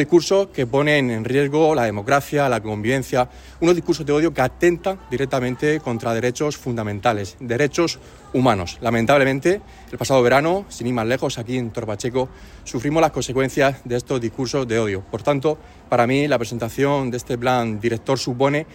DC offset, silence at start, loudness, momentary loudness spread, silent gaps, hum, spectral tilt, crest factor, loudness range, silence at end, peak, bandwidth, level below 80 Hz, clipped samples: under 0.1%; 0 s; -20 LUFS; 8 LU; none; none; -5.5 dB/octave; 16 dB; 3 LU; 0.1 s; -4 dBFS; 16.5 kHz; -46 dBFS; under 0.1%